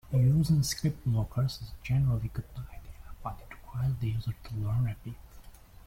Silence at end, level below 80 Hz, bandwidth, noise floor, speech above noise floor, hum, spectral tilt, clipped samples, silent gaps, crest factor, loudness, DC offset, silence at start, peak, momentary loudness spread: 0.05 s; -46 dBFS; 16.5 kHz; -50 dBFS; 21 dB; none; -6.5 dB/octave; under 0.1%; none; 14 dB; -30 LUFS; under 0.1%; 0.05 s; -16 dBFS; 20 LU